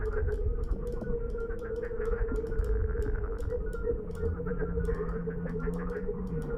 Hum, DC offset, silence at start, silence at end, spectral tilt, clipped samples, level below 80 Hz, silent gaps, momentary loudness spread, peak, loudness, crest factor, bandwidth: none; under 0.1%; 0 s; 0 s; -9.5 dB/octave; under 0.1%; -34 dBFS; none; 3 LU; -16 dBFS; -34 LUFS; 14 dB; 9.8 kHz